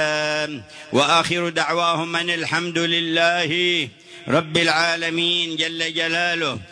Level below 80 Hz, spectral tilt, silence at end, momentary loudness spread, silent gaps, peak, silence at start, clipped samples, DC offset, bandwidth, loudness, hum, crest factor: -62 dBFS; -3.5 dB/octave; 0 s; 6 LU; none; -4 dBFS; 0 s; under 0.1%; under 0.1%; 10.5 kHz; -19 LUFS; none; 18 dB